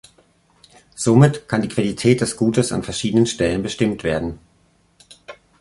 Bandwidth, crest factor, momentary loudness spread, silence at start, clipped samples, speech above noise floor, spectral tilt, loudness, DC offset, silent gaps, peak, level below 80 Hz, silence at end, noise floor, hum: 11.5 kHz; 18 dB; 9 LU; 0.95 s; under 0.1%; 41 dB; -6 dB/octave; -19 LUFS; under 0.1%; none; -2 dBFS; -46 dBFS; 0.3 s; -59 dBFS; none